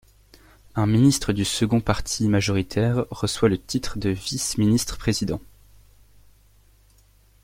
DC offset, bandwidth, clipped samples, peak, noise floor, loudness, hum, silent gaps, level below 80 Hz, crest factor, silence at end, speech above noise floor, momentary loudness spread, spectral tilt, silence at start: under 0.1%; 16.5 kHz; under 0.1%; -4 dBFS; -56 dBFS; -23 LUFS; none; none; -42 dBFS; 20 dB; 2 s; 34 dB; 8 LU; -5 dB/octave; 0.75 s